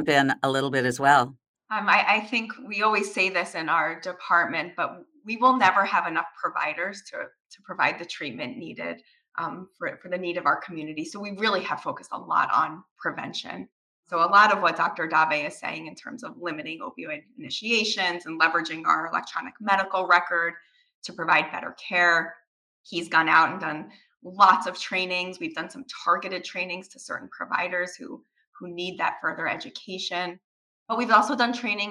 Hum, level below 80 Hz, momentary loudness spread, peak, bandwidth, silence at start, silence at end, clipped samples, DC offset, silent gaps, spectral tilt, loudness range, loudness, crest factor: none; -76 dBFS; 16 LU; -4 dBFS; 15 kHz; 0 s; 0 s; under 0.1%; under 0.1%; 1.48-1.54 s, 7.40-7.50 s, 12.91-12.96 s, 13.72-14.03 s, 20.95-21.02 s, 22.47-22.84 s, 28.47-28.53 s, 30.44-30.86 s; -3.5 dB/octave; 7 LU; -24 LUFS; 22 dB